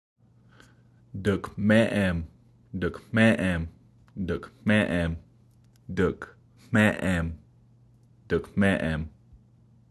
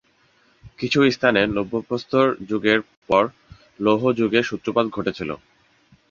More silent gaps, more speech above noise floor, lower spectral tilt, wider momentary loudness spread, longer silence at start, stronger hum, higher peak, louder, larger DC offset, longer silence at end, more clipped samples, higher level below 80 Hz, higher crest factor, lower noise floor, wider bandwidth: second, none vs 2.97-3.02 s; second, 33 dB vs 40 dB; about the same, -7 dB/octave vs -6 dB/octave; first, 18 LU vs 9 LU; first, 1.15 s vs 0.65 s; neither; second, -6 dBFS vs -2 dBFS; second, -26 LUFS vs -21 LUFS; neither; about the same, 0.8 s vs 0.75 s; neither; first, -44 dBFS vs -54 dBFS; about the same, 22 dB vs 20 dB; about the same, -58 dBFS vs -60 dBFS; first, 12.5 kHz vs 7.4 kHz